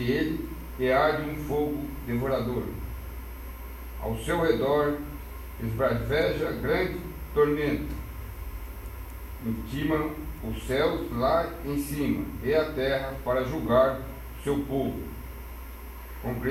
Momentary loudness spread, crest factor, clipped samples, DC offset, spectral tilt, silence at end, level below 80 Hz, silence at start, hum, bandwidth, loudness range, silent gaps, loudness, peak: 16 LU; 18 dB; under 0.1%; under 0.1%; -6.5 dB/octave; 0 s; -40 dBFS; 0 s; none; 16 kHz; 4 LU; none; -28 LUFS; -10 dBFS